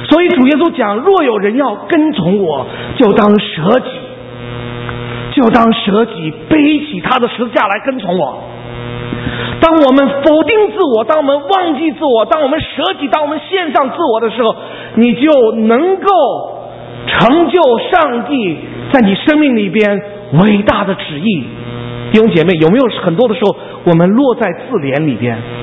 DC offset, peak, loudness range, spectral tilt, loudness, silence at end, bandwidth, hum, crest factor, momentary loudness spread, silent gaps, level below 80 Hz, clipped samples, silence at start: under 0.1%; 0 dBFS; 3 LU; -8.5 dB/octave; -11 LUFS; 0 s; 6.2 kHz; none; 12 dB; 13 LU; none; -42 dBFS; 0.2%; 0 s